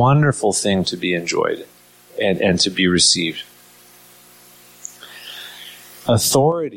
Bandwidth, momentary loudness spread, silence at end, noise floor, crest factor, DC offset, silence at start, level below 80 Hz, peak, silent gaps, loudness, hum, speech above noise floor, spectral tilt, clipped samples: 17 kHz; 22 LU; 0 s; -47 dBFS; 18 dB; under 0.1%; 0 s; -52 dBFS; -2 dBFS; none; -17 LUFS; 60 Hz at -40 dBFS; 30 dB; -4 dB/octave; under 0.1%